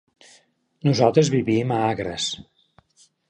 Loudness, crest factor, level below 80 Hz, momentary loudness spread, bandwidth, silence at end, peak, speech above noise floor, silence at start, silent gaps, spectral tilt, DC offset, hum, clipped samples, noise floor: -21 LUFS; 20 dB; -56 dBFS; 9 LU; 10 kHz; 0.9 s; -2 dBFS; 39 dB; 0.85 s; none; -5.5 dB/octave; under 0.1%; none; under 0.1%; -59 dBFS